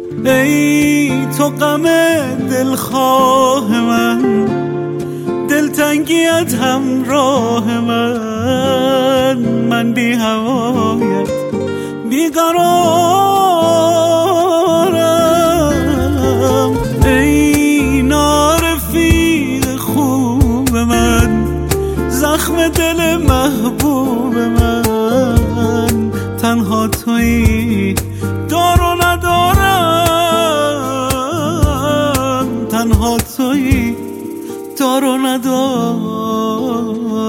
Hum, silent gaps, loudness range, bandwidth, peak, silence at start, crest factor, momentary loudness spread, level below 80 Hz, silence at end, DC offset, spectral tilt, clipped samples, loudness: none; none; 3 LU; 17 kHz; 0 dBFS; 0 s; 12 dB; 6 LU; -26 dBFS; 0 s; under 0.1%; -5 dB/octave; under 0.1%; -13 LUFS